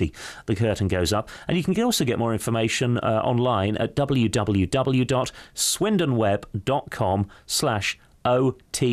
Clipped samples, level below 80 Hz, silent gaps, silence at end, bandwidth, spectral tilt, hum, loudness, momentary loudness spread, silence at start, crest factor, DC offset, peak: under 0.1%; -48 dBFS; none; 0 s; 15.5 kHz; -5 dB/octave; none; -23 LUFS; 5 LU; 0 s; 12 dB; under 0.1%; -10 dBFS